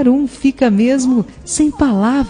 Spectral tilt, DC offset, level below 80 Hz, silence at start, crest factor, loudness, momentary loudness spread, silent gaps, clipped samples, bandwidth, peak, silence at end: -5.5 dB/octave; under 0.1%; -38 dBFS; 0 s; 12 dB; -14 LUFS; 4 LU; none; under 0.1%; 10 kHz; 0 dBFS; 0 s